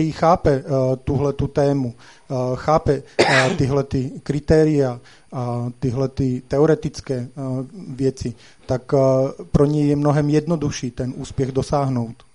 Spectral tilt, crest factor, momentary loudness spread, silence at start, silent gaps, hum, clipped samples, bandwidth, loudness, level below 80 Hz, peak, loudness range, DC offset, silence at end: -6.5 dB/octave; 20 dB; 11 LU; 0 s; none; none; under 0.1%; 11 kHz; -20 LUFS; -40 dBFS; 0 dBFS; 4 LU; 0.3%; 0.2 s